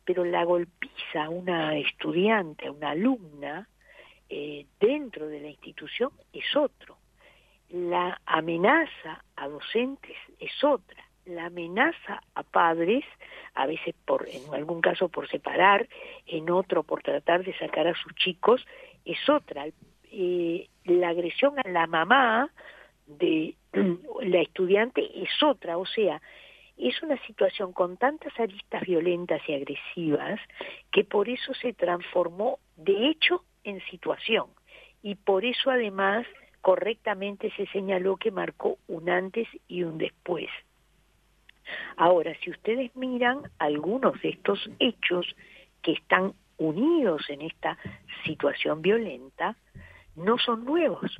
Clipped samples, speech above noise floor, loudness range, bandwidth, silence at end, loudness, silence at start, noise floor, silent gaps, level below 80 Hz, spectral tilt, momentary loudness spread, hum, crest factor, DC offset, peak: under 0.1%; 38 dB; 5 LU; 6.6 kHz; 0 s; -27 LUFS; 0.05 s; -65 dBFS; none; -66 dBFS; -7 dB/octave; 14 LU; none; 24 dB; under 0.1%; -4 dBFS